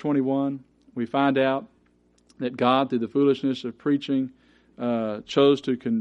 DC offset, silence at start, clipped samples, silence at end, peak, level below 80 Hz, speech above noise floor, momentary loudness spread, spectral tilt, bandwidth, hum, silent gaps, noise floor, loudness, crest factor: under 0.1%; 0 s; under 0.1%; 0 s; -6 dBFS; -68 dBFS; 39 dB; 12 LU; -7 dB/octave; 7.8 kHz; 60 Hz at -50 dBFS; none; -62 dBFS; -24 LUFS; 18 dB